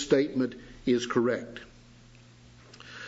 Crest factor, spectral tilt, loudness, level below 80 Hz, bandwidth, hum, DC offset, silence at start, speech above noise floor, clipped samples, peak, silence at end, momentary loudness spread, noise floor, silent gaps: 20 dB; -5 dB/octave; -29 LUFS; -60 dBFS; 8 kHz; none; under 0.1%; 0 s; 26 dB; under 0.1%; -10 dBFS; 0 s; 21 LU; -54 dBFS; none